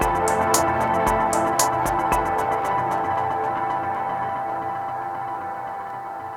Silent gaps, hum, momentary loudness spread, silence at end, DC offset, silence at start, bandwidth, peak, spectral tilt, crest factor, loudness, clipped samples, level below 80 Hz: none; none; 10 LU; 0 s; under 0.1%; 0 s; over 20 kHz; -2 dBFS; -3.5 dB/octave; 22 dB; -23 LUFS; under 0.1%; -42 dBFS